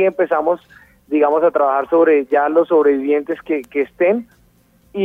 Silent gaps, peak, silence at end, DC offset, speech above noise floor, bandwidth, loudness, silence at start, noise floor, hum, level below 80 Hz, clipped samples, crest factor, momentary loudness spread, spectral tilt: none; -2 dBFS; 0 s; under 0.1%; 39 dB; 3.8 kHz; -16 LUFS; 0 s; -54 dBFS; none; -60 dBFS; under 0.1%; 14 dB; 9 LU; -7.5 dB/octave